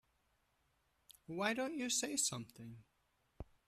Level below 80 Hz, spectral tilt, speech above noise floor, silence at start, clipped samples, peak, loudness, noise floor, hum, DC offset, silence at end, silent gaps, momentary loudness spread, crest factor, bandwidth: -68 dBFS; -2 dB/octave; 39 dB; 1.3 s; under 0.1%; -22 dBFS; -38 LUFS; -80 dBFS; none; under 0.1%; 0.25 s; none; 20 LU; 22 dB; 15 kHz